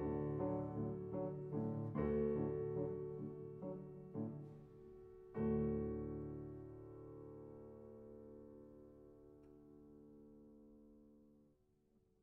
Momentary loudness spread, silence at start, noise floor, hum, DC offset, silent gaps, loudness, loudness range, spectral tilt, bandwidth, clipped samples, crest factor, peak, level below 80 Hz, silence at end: 23 LU; 0 s; -77 dBFS; none; under 0.1%; none; -45 LUFS; 19 LU; -11 dB/octave; 3.3 kHz; under 0.1%; 18 dB; -28 dBFS; -62 dBFS; 0.8 s